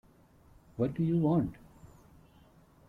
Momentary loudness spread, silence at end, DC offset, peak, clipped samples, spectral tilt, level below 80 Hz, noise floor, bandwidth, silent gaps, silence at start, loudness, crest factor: 11 LU; 1.05 s; under 0.1%; -18 dBFS; under 0.1%; -10.5 dB/octave; -60 dBFS; -61 dBFS; 4.3 kHz; none; 0.8 s; -31 LUFS; 18 dB